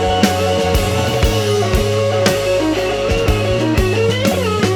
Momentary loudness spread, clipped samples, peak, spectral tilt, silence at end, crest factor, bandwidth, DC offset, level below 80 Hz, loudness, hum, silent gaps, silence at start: 2 LU; under 0.1%; -2 dBFS; -5 dB/octave; 0 s; 14 dB; over 20 kHz; under 0.1%; -24 dBFS; -15 LUFS; none; none; 0 s